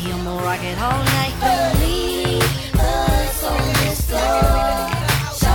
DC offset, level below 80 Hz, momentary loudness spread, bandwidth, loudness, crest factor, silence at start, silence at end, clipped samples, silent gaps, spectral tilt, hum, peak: under 0.1%; -24 dBFS; 5 LU; 19 kHz; -19 LUFS; 14 dB; 0 s; 0 s; under 0.1%; none; -4.5 dB/octave; none; -4 dBFS